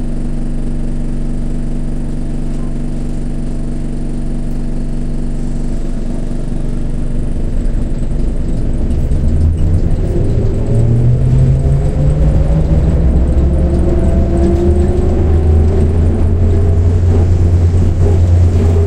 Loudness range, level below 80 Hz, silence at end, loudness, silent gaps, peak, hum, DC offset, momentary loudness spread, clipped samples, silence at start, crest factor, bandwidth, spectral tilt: 10 LU; -14 dBFS; 0 s; -15 LUFS; none; 0 dBFS; none; under 0.1%; 10 LU; under 0.1%; 0 s; 10 dB; 9.6 kHz; -9 dB/octave